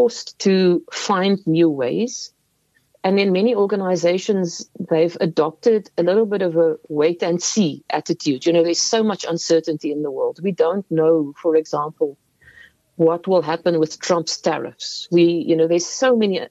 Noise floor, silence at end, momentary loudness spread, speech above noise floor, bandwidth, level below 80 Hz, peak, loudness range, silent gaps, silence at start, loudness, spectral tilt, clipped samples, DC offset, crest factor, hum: -64 dBFS; 0.05 s; 7 LU; 45 dB; 8.2 kHz; -72 dBFS; -4 dBFS; 2 LU; none; 0 s; -19 LUFS; -5 dB/octave; under 0.1%; under 0.1%; 14 dB; none